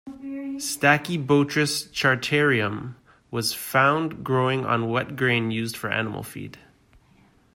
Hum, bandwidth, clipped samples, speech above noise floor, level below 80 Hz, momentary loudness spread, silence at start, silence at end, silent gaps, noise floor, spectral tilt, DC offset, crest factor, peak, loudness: none; 16 kHz; under 0.1%; 34 dB; -60 dBFS; 14 LU; 0.05 s; 1 s; none; -58 dBFS; -4.5 dB/octave; under 0.1%; 20 dB; -4 dBFS; -23 LUFS